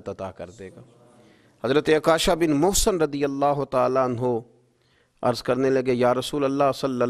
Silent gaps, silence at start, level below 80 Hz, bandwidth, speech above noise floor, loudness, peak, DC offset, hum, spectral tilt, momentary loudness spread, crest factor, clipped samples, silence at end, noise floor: none; 0.05 s; -42 dBFS; 14.5 kHz; 41 dB; -22 LUFS; -6 dBFS; under 0.1%; none; -4.5 dB/octave; 15 LU; 18 dB; under 0.1%; 0 s; -63 dBFS